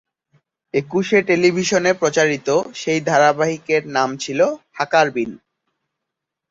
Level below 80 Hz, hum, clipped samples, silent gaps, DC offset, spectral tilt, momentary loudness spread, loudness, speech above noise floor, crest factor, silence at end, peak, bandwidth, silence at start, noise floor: -62 dBFS; none; under 0.1%; none; under 0.1%; -4.5 dB/octave; 7 LU; -18 LUFS; 64 dB; 18 dB; 1.15 s; -2 dBFS; 8 kHz; 0.75 s; -82 dBFS